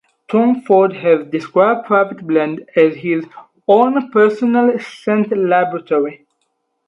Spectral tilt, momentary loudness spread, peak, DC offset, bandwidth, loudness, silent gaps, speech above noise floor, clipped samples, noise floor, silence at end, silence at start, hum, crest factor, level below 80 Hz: -8 dB/octave; 7 LU; 0 dBFS; under 0.1%; 7.6 kHz; -15 LUFS; none; 54 dB; under 0.1%; -68 dBFS; 0.7 s; 0.3 s; none; 14 dB; -68 dBFS